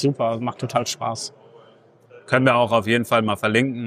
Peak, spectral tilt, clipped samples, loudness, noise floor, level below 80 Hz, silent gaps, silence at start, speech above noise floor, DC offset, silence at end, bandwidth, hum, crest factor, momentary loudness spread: -2 dBFS; -5 dB/octave; under 0.1%; -21 LUFS; -52 dBFS; -64 dBFS; none; 0 s; 32 dB; under 0.1%; 0 s; 15.5 kHz; none; 20 dB; 10 LU